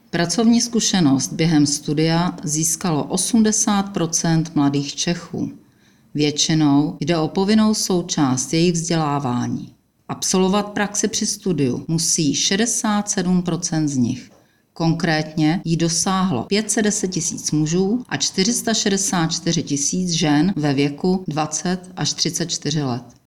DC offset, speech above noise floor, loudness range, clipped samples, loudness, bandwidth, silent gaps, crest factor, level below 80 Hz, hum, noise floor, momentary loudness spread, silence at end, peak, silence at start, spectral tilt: under 0.1%; 35 dB; 2 LU; under 0.1%; -19 LUFS; 16 kHz; none; 14 dB; -50 dBFS; none; -54 dBFS; 6 LU; 0.25 s; -4 dBFS; 0.15 s; -4 dB/octave